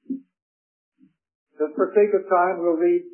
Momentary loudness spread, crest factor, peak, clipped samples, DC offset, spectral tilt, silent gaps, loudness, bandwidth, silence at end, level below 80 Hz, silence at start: 12 LU; 18 dB; -6 dBFS; under 0.1%; under 0.1%; -11.5 dB/octave; 0.42-0.92 s, 1.35-1.47 s; -21 LUFS; 3.1 kHz; 0.05 s; -86 dBFS; 0.1 s